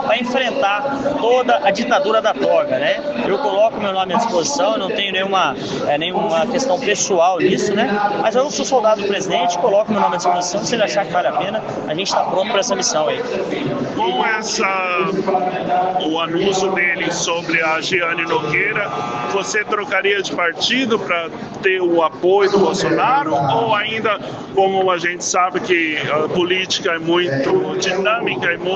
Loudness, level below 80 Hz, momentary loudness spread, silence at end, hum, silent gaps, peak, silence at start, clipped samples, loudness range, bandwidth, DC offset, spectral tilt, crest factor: -17 LUFS; -56 dBFS; 4 LU; 0 s; none; none; -2 dBFS; 0 s; under 0.1%; 2 LU; 8.4 kHz; under 0.1%; -3.5 dB/octave; 14 dB